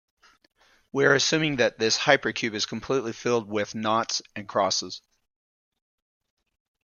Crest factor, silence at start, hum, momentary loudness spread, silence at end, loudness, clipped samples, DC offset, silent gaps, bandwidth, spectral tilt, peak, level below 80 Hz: 26 dB; 0.95 s; none; 10 LU; 1.85 s; -24 LUFS; under 0.1%; under 0.1%; none; 10 kHz; -3 dB/octave; -2 dBFS; -66 dBFS